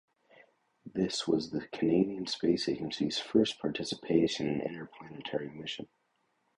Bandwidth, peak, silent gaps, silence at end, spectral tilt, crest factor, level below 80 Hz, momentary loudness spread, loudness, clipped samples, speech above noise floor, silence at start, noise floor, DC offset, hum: 11 kHz; -12 dBFS; none; 0.7 s; -5 dB/octave; 20 dB; -66 dBFS; 12 LU; -32 LUFS; under 0.1%; 44 dB; 0.85 s; -76 dBFS; under 0.1%; none